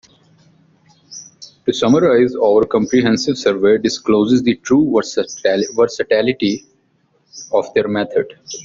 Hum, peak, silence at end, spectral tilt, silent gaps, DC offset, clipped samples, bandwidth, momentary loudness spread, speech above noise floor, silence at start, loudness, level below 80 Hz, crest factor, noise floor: none; -2 dBFS; 0 s; -5 dB/octave; none; under 0.1%; under 0.1%; 7.6 kHz; 10 LU; 45 dB; 1.1 s; -16 LUFS; -54 dBFS; 14 dB; -60 dBFS